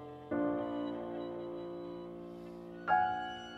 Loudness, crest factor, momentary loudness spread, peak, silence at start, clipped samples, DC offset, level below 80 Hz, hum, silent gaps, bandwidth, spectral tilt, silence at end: -38 LUFS; 20 dB; 16 LU; -18 dBFS; 0 s; under 0.1%; under 0.1%; -68 dBFS; none; none; 7.8 kHz; -6.5 dB/octave; 0 s